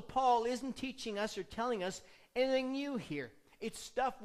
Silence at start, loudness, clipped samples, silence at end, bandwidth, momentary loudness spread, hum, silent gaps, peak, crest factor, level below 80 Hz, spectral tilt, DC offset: 0 s; -37 LUFS; under 0.1%; 0 s; 14.5 kHz; 13 LU; none; none; -20 dBFS; 18 dB; -64 dBFS; -4 dB/octave; under 0.1%